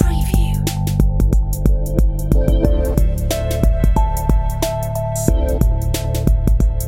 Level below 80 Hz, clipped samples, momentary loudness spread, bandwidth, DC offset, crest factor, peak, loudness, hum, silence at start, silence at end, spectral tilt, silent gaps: -16 dBFS; under 0.1%; 4 LU; 17 kHz; 0.4%; 14 dB; 0 dBFS; -18 LUFS; none; 0 s; 0 s; -6.5 dB/octave; none